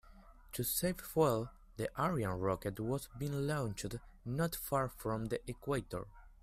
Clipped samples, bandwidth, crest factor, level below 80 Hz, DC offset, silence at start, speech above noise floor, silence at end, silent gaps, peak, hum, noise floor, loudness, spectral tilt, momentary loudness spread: under 0.1%; 16 kHz; 20 dB; -56 dBFS; under 0.1%; 0.05 s; 21 dB; 0.1 s; none; -18 dBFS; none; -58 dBFS; -38 LUFS; -5.5 dB/octave; 12 LU